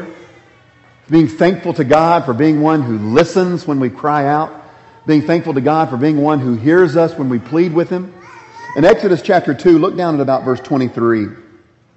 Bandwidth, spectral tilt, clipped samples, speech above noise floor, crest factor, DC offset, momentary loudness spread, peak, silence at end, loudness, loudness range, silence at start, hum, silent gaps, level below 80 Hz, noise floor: 8.2 kHz; -7.5 dB/octave; under 0.1%; 34 dB; 14 dB; under 0.1%; 8 LU; 0 dBFS; 0.55 s; -14 LUFS; 2 LU; 0 s; none; none; -50 dBFS; -47 dBFS